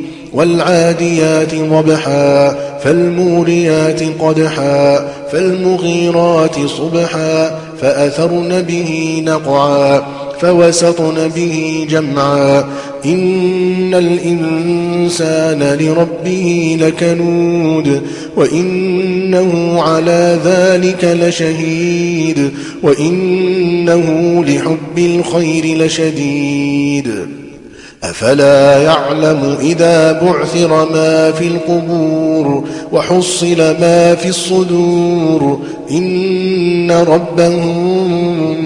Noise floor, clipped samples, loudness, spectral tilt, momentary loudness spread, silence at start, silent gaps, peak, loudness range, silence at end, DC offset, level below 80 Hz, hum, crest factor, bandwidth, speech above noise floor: -34 dBFS; under 0.1%; -11 LUFS; -5.5 dB/octave; 6 LU; 0 s; none; 0 dBFS; 2 LU; 0 s; under 0.1%; -48 dBFS; none; 12 dB; 11.5 kHz; 23 dB